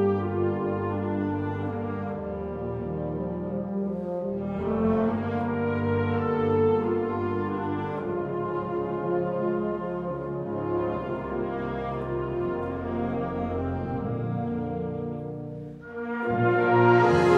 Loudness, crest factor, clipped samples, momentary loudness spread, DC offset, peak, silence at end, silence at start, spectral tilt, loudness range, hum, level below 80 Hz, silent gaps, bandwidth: -28 LUFS; 20 dB; under 0.1%; 9 LU; under 0.1%; -6 dBFS; 0 s; 0 s; -9 dB/octave; 5 LU; none; -52 dBFS; none; 8.6 kHz